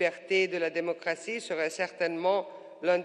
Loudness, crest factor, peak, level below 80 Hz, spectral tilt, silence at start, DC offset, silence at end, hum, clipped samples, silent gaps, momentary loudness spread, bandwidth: -30 LUFS; 16 dB; -14 dBFS; -86 dBFS; -4 dB/octave; 0 s; under 0.1%; 0 s; none; under 0.1%; none; 6 LU; 10.5 kHz